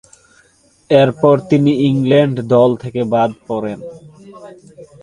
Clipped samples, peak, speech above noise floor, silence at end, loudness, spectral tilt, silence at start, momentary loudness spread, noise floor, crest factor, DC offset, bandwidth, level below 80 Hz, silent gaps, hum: under 0.1%; 0 dBFS; 38 dB; 0.15 s; -14 LUFS; -8 dB/octave; 0.9 s; 11 LU; -52 dBFS; 16 dB; under 0.1%; 10.5 kHz; -54 dBFS; none; none